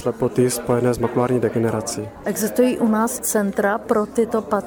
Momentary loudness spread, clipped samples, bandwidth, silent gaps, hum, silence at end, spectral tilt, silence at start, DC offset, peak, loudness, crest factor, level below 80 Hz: 5 LU; under 0.1%; over 20 kHz; none; none; 0 s; -5.5 dB/octave; 0 s; under 0.1%; -4 dBFS; -20 LUFS; 16 dB; -48 dBFS